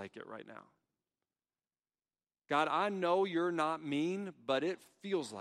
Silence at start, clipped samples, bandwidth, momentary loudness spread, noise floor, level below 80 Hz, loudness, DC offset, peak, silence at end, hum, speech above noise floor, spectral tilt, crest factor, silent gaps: 0 s; under 0.1%; 12.5 kHz; 16 LU; under -90 dBFS; -86 dBFS; -35 LUFS; under 0.1%; -18 dBFS; 0 s; none; over 54 dB; -5.5 dB/octave; 18 dB; none